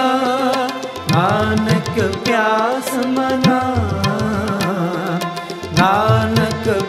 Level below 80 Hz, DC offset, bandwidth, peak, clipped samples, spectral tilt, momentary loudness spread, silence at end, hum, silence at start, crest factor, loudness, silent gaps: -44 dBFS; under 0.1%; 16 kHz; 0 dBFS; under 0.1%; -5.5 dB/octave; 6 LU; 0 s; none; 0 s; 16 dB; -17 LUFS; none